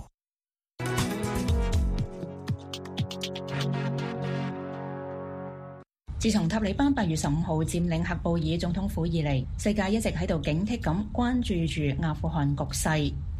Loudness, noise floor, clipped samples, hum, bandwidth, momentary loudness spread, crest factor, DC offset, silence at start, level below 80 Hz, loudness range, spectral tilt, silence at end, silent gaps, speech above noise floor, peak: -29 LUFS; under -90 dBFS; under 0.1%; none; 15.5 kHz; 10 LU; 16 dB; under 0.1%; 0 s; -38 dBFS; 6 LU; -6 dB/octave; 0 s; none; over 63 dB; -12 dBFS